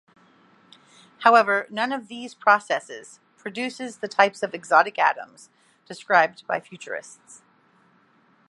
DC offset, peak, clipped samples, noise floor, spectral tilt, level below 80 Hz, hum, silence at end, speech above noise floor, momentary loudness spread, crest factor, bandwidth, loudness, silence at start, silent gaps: under 0.1%; -2 dBFS; under 0.1%; -60 dBFS; -3 dB/octave; -82 dBFS; none; 1.5 s; 37 dB; 20 LU; 24 dB; 11.5 kHz; -22 LUFS; 1.2 s; none